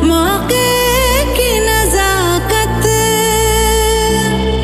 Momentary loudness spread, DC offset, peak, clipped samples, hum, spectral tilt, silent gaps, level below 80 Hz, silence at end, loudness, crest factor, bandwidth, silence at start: 2 LU; under 0.1%; 0 dBFS; under 0.1%; 60 Hz at -35 dBFS; -3.5 dB/octave; none; -20 dBFS; 0 s; -12 LUFS; 12 dB; 16 kHz; 0 s